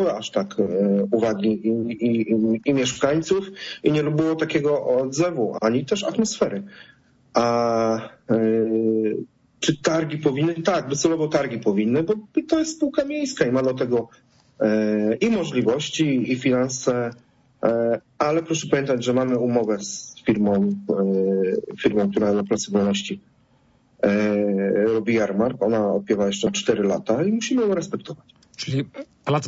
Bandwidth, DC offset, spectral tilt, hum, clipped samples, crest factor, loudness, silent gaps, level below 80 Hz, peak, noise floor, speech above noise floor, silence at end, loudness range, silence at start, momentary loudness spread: 8 kHz; under 0.1%; -5.5 dB/octave; none; under 0.1%; 16 dB; -22 LUFS; none; -58 dBFS; -6 dBFS; -59 dBFS; 38 dB; 0 s; 1 LU; 0 s; 5 LU